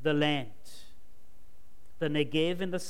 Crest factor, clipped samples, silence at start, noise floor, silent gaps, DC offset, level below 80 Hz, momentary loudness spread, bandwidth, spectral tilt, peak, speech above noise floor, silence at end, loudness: 18 dB; under 0.1%; 0 s; -60 dBFS; none; 1%; -62 dBFS; 22 LU; 16 kHz; -5.5 dB/octave; -14 dBFS; 30 dB; 0 s; -30 LUFS